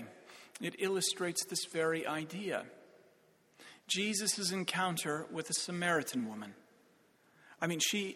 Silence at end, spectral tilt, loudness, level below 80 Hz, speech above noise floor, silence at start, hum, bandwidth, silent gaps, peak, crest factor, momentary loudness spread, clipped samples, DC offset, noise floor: 0 s; -2.5 dB/octave; -35 LUFS; -82 dBFS; 32 dB; 0 s; none; 17 kHz; none; -16 dBFS; 22 dB; 18 LU; under 0.1%; under 0.1%; -68 dBFS